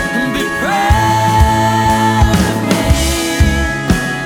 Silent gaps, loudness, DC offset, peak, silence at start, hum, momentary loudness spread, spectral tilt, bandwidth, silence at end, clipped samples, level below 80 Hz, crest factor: none; -13 LUFS; under 0.1%; 0 dBFS; 0 s; none; 4 LU; -5 dB/octave; 18 kHz; 0 s; under 0.1%; -20 dBFS; 12 dB